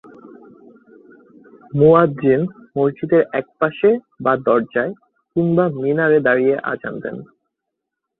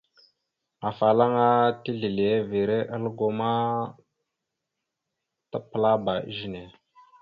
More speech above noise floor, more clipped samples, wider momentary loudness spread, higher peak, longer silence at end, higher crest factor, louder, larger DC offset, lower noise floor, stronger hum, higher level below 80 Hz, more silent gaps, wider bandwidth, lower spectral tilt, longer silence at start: first, 63 dB vs 59 dB; neither; second, 12 LU vs 15 LU; first, -2 dBFS vs -8 dBFS; first, 0.95 s vs 0.55 s; about the same, 18 dB vs 20 dB; first, -17 LUFS vs -25 LUFS; neither; second, -80 dBFS vs -84 dBFS; neither; first, -56 dBFS vs -64 dBFS; neither; second, 4.1 kHz vs 5.6 kHz; first, -11 dB/octave vs -9 dB/octave; second, 0.25 s vs 0.8 s